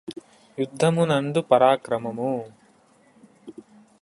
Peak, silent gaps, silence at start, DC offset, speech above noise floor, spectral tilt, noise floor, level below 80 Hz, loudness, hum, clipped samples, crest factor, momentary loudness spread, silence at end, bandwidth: -4 dBFS; none; 0.1 s; under 0.1%; 36 dB; -6 dB/octave; -58 dBFS; -66 dBFS; -22 LUFS; none; under 0.1%; 20 dB; 25 LU; 0.5 s; 11.5 kHz